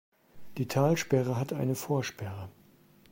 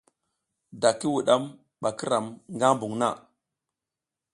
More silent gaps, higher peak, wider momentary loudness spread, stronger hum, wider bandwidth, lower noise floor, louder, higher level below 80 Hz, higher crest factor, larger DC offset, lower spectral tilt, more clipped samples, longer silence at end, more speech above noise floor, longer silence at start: neither; second, -12 dBFS vs -4 dBFS; first, 16 LU vs 11 LU; neither; first, 16.5 kHz vs 11.5 kHz; second, -60 dBFS vs -89 dBFS; second, -30 LUFS vs -26 LUFS; first, -66 dBFS vs -72 dBFS; second, 18 dB vs 24 dB; neither; first, -6 dB/octave vs -4.5 dB/octave; neither; second, 0.6 s vs 1.15 s; second, 30 dB vs 63 dB; second, 0.35 s vs 0.75 s